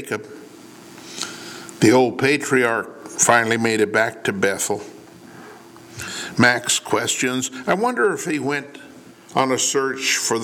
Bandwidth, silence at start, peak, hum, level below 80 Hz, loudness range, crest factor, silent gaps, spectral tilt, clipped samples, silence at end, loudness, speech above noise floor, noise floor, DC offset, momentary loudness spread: 18.5 kHz; 0 s; -2 dBFS; none; -66 dBFS; 3 LU; 20 dB; none; -3 dB/octave; under 0.1%; 0 s; -19 LUFS; 24 dB; -43 dBFS; under 0.1%; 18 LU